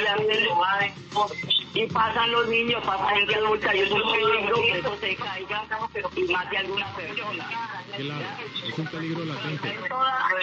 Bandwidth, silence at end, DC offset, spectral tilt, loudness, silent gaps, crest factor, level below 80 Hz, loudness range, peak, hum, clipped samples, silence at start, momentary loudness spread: 8 kHz; 0 s; under 0.1%; -4.5 dB/octave; -25 LUFS; none; 14 dB; -58 dBFS; 7 LU; -12 dBFS; none; under 0.1%; 0 s; 10 LU